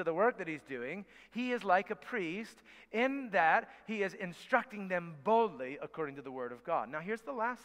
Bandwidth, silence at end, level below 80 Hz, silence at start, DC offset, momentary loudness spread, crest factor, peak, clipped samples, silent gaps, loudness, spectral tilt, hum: 14 kHz; 0 s; -78 dBFS; 0 s; under 0.1%; 12 LU; 22 dB; -14 dBFS; under 0.1%; none; -35 LUFS; -6 dB/octave; none